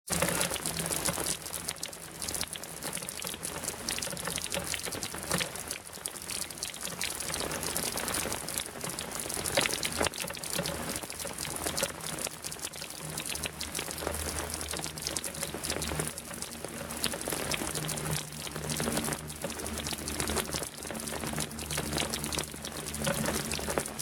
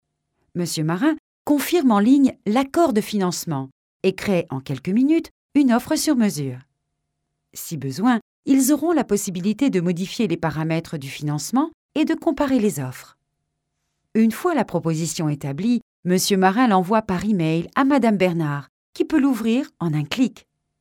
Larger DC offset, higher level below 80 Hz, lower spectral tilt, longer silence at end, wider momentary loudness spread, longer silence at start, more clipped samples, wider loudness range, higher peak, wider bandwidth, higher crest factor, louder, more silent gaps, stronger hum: neither; first, -50 dBFS vs -56 dBFS; second, -2.5 dB/octave vs -5.5 dB/octave; second, 0 s vs 0.5 s; second, 7 LU vs 11 LU; second, 0.05 s vs 0.55 s; neither; about the same, 3 LU vs 4 LU; second, -8 dBFS vs -4 dBFS; about the same, 18 kHz vs 17.5 kHz; first, 28 dB vs 18 dB; second, -33 LUFS vs -21 LUFS; second, none vs 1.19-1.45 s, 3.72-4.00 s, 5.31-5.49 s, 8.22-8.43 s, 11.74-11.89 s, 15.82-16.03 s, 18.69-18.93 s; neither